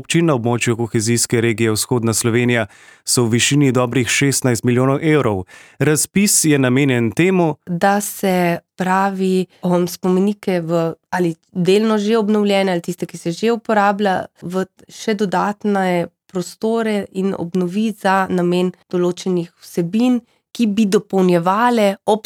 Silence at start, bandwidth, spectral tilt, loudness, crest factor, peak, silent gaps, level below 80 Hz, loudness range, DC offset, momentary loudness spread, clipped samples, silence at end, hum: 0 s; over 20 kHz; -5 dB/octave; -17 LUFS; 14 dB; -2 dBFS; none; -58 dBFS; 4 LU; under 0.1%; 8 LU; under 0.1%; 0.05 s; none